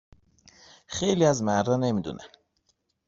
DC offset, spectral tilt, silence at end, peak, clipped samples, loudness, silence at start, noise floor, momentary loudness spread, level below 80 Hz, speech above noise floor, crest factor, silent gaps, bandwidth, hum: under 0.1%; -5.5 dB/octave; 0.8 s; -8 dBFS; under 0.1%; -25 LUFS; 0.9 s; -73 dBFS; 15 LU; -60 dBFS; 48 dB; 20 dB; none; 7.8 kHz; none